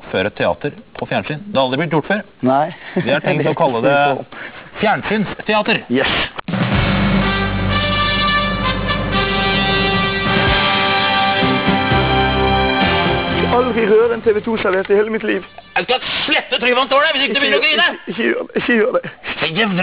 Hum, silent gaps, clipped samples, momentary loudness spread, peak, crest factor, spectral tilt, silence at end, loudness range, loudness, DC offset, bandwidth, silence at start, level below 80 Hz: none; none; under 0.1%; 8 LU; -4 dBFS; 12 dB; -9 dB/octave; 0 s; 3 LU; -15 LUFS; 0.3%; 4 kHz; 0 s; -32 dBFS